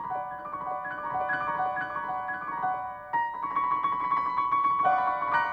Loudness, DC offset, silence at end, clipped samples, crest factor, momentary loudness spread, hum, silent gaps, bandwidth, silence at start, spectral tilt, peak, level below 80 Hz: -29 LUFS; under 0.1%; 0 s; under 0.1%; 16 dB; 9 LU; none; none; 6.2 kHz; 0 s; -6 dB/octave; -12 dBFS; -64 dBFS